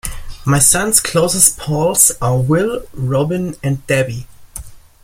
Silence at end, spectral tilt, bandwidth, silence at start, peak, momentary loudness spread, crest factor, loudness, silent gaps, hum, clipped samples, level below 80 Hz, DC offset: 0.25 s; -4 dB/octave; over 20 kHz; 0.05 s; 0 dBFS; 19 LU; 16 dB; -14 LUFS; none; none; under 0.1%; -36 dBFS; under 0.1%